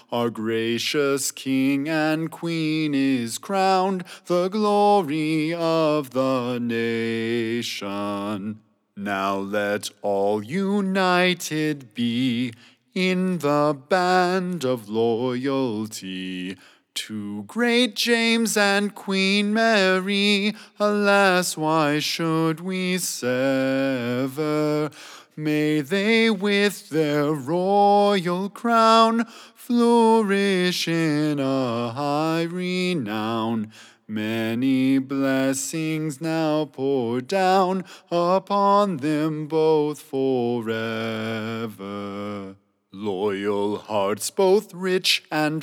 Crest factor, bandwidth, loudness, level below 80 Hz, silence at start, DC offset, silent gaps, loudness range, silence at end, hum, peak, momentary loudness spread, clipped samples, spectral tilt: 20 dB; 18.5 kHz; -22 LUFS; -88 dBFS; 0.1 s; under 0.1%; none; 6 LU; 0 s; none; -2 dBFS; 11 LU; under 0.1%; -4.5 dB/octave